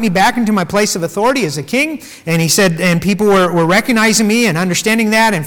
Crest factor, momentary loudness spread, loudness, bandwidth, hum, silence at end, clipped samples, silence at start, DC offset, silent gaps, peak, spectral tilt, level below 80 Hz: 10 dB; 5 LU; -12 LUFS; 19 kHz; none; 0 s; under 0.1%; 0 s; under 0.1%; none; -2 dBFS; -4 dB/octave; -46 dBFS